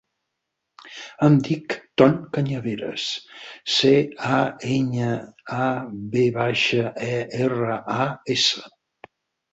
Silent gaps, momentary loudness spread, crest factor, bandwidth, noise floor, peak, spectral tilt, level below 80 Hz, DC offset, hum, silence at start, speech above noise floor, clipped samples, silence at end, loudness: none; 13 LU; 20 dB; 8.2 kHz; -80 dBFS; -2 dBFS; -5.5 dB/octave; -60 dBFS; under 0.1%; none; 0.85 s; 58 dB; under 0.1%; 0.85 s; -22 LUFS